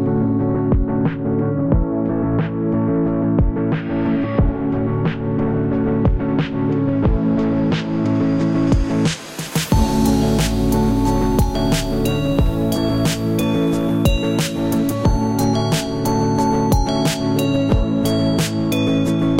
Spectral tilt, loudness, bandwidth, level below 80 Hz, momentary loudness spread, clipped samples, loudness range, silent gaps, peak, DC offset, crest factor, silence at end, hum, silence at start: -6.5 dB/octave; -18 LUFS; 16.5 kHz; -26 dBFS; 3 LU; under 0.1%; 1 LU; none; -2 dBFS; 0.5%; 14 dB; 0 s; none; 0 s